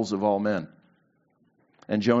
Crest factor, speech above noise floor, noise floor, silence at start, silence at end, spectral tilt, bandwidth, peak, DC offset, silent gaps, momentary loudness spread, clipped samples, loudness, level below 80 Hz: 22 dB; 43 dB; -68 dBFS; 0 s; 0 s; -5.5 dB/octave; 7.6 kHz; -6 dBFS; under 0.1%; none; 9 LU; under 0.1%; -26 LUFS; -70 dBFS